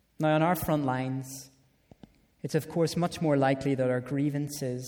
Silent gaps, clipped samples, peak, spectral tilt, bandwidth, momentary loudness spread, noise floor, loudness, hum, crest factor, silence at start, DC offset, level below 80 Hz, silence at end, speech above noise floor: none; under 0.1%; -14 dBFS; -6.5 dB/octave; over 20 kHz; 10 LU; -57 dBFS; -29 LUFS; none; 16 dB; 0.2 s; under 0.1%; -58 dBFS; 0 s; 29 dB